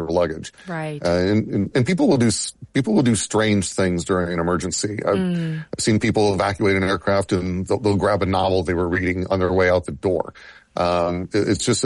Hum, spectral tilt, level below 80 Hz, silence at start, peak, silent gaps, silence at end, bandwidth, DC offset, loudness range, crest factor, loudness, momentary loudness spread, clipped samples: none; -5 dB/octave; -46 dBFS; 0 s; -6 dBFS; none; 0 s; 11.5 kHz; under 0.1%; 1 LU; 14 dB; -20 LUFS; 6 LU; under 0.1%